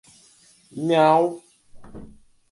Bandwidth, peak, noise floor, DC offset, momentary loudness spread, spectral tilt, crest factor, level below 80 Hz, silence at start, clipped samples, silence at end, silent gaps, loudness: 11.5 kHz; -4 dBFS; -55 dBFS; under 0.1%; 24 LU; -6.5 dB/octave; 20 dB; -56 dBFS; 0.75 s; under 0.1%; 0.45 s; none; -20 LUFS